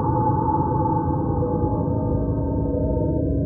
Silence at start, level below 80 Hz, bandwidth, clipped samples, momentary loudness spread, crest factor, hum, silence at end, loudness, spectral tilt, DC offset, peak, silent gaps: 0 s; -32 dBFS; 1.8 kHz; under 0.1%; 3 LU; 12 dB; none; 0 s; -22 LUFS; -4 dB/octave; under 0.1%; -8 dBFS; none